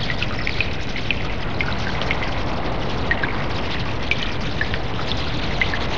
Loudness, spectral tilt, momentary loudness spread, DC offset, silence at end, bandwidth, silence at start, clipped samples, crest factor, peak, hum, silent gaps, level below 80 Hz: -24 LUFS; -5.5 dB/octave; 3 LU; 6%; 0 s; 7.8 kHz; 0 s; under 0.1%; 22 dB; -2 dBFS; none; none; -32 dBFS